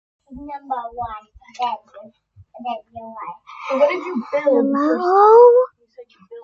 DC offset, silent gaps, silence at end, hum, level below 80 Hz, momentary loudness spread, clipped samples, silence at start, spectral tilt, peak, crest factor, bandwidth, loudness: under 0.1%; none; 0 s; none; -56 dBFS; 24 LU; under 0.1%; 0.3 s; -6 dB/octave; -2 dBFS; 18 dB; 6.8 kHz; -16 LUFS